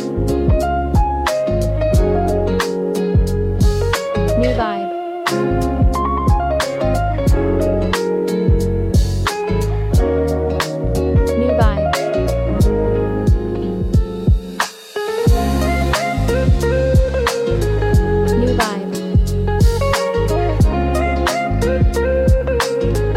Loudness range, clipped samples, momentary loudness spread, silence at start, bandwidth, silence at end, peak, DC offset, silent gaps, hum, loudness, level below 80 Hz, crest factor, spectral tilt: 2 LU; under 0.1%; 4 LU; 0 s; 16 kHz; 0 s; -2 dBFS; under 0.1%; none; none; -17 LUFS; -20 dBFS; 14 dB; -6.5 dB/octave